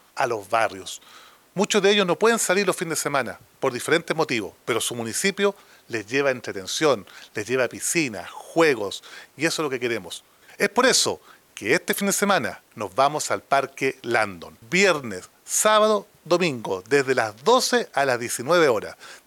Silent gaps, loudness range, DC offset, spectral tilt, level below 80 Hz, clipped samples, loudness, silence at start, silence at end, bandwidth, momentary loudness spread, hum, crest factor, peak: none; 3 LU; under 0.1%; -3 dB/octave; -72 dBFS; under 0.1%; -22 LUFS; 0.15 s; 0.1 s; 19 kHz; 14 LU; none; 18 dB; -6 dBFS